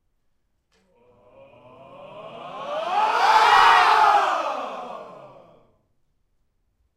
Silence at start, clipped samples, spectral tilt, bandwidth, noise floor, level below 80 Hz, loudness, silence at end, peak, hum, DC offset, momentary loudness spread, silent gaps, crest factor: 2 s; under 0.1%; -1 dB/octave; 15.5 kHz; -69 dBFS; -62 dBFS; -18 LUFS; 1.85 s; -4 dBFS; none; under 0.1%; 25 LU; none; 20 dB